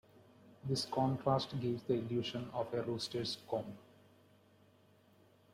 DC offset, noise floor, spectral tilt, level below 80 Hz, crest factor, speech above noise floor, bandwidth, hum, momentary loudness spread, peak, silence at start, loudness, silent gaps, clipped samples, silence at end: under 0.1%; -67 dBFS; -6 dB/octave; -70 dBFS; 20 dB; 30 dB; 15 kHz; none; 7 LU; -20 dBFS; 0.45 s; -38 LUFS; none; under 0.1%; 1.7 s